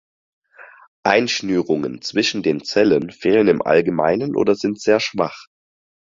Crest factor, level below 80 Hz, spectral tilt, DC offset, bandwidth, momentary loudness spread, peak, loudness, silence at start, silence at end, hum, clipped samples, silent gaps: 18 dB; -58 dBFS; -5 dB/octave; under 0.1%; 7.6 kHz; 6 LU; -2 dBFS; -18 LUFS; 0.6 s; 0.75 s; none; under 0.1%; 0.87-1.03 s